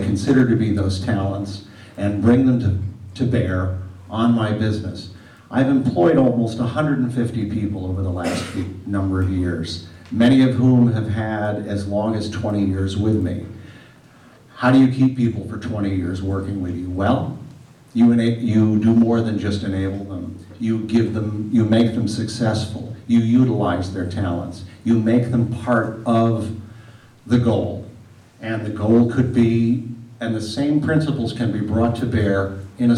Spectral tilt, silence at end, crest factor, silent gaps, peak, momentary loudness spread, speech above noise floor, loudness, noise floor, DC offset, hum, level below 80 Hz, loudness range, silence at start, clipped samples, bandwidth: -7.5 dB/octave; 0 s; 14 dB; none; -6 dBFS; 13 LU; 29 dB; -20 LUFS; -47 dBFS; under 0.1%; none; -50 dBFS; 3 LU; 0 s; under 0.1%; 11 kHz